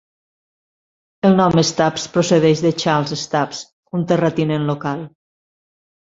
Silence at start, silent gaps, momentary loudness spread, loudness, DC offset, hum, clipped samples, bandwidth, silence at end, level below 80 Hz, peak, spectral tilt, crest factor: 1.25 s; 3.72-3.83 s; 12 LU; -17 LUFS; under 0.1%; none; under 0.1%; 7.8 kHz; 1 s; -54 dBFS; -2 dBFS; -5.5 dB/octave; 18 dB